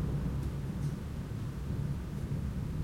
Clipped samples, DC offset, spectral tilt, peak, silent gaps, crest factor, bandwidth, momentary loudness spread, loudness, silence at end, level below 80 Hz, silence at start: under 0.1%; under 0.1%; -8 dB/octave; -22 dBFS; none; 12 dB; 16 kHz; 4 LU; -37 LUFS; 0 s; -42 dBFS; 0 s